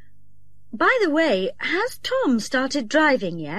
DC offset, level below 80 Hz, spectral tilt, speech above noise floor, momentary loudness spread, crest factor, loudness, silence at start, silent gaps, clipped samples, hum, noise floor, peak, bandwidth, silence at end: 1%; -58 dBFS; -4 dB/octave; 37 dB; 6 LU; 16 dB; -21 LUFS; 0.75 s; none; under 0.1%; 50 Hz at -60 dBFS; -58 dBFS; -6 dBFS; 14 kHz; 0 s